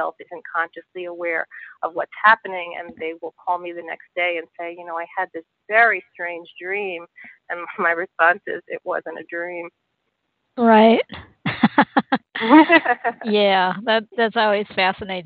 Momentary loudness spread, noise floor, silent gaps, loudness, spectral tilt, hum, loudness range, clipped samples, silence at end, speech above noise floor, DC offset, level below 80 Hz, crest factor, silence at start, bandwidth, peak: 17 LU; -74 dBFS; none; -20 LUFS; -9 dB/octave; none; 7 LU; under 0.1%; 0 s; 53 dB; under 0.1%; -64 dBFS; 20 dB; 0 s; 4.8 kHz; 0 dBFS